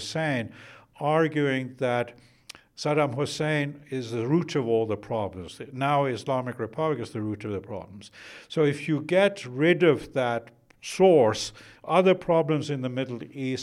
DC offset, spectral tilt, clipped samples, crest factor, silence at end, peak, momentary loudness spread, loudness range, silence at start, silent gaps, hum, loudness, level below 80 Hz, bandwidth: under 0.1%; -6 dB/octave; under 0.1%; 18 dB; 0 s; -8 dBFS; 15 LU; 6 LU; 0 s; none; none; -26 LUFS; -64 dBFS; 12.5 kHz